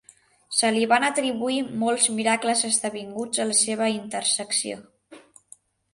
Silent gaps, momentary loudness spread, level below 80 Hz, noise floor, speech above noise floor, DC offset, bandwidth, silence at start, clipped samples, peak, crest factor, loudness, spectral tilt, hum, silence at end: none; 7 LU; -72 dBFS; -54 dBFS; 30 dB; under 0.1%; 11.5 kHz; 0.5 s; under 0.1%; -6 dBFS; 18 dB; -23 LUFS; -1.5 dB/octave; none; 0.75 s